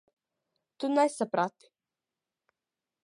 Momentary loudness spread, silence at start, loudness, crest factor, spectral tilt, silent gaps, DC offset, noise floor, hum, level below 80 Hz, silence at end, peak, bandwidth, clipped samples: 8 LU; 0.8 s; -29 LUFS; 22 dB; -5 dB/octave; none; under 0.1%; under -90 dBFS; none; -88 dBFS; 1.55 s; -12 dBFS; 11.5 kHz; under 0.1%